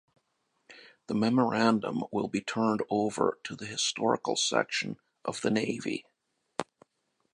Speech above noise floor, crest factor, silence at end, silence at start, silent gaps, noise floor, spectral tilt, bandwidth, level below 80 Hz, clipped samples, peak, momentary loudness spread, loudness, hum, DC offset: 49 dB; 22 dB; 0.7 s; 0.7 s; none; -78 dBFS; -4 dB/octave; 11 kHz; -72 dBFS; under 0.1%; -8 dBFS; 13 LU; -30 LUFS; none; under 0.1%